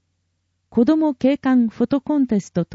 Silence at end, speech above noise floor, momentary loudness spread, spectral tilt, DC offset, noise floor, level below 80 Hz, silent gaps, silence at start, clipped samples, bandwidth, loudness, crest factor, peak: 0.1 s; 53 dB; 5 LU; -7.5 dB/octave; under 0.1%; -71 dBFS; -56 dBFS; none; 0.75 s; under 0.1%; 7.8 kHz; -19 LUFS; 14 dB; -6 dBFS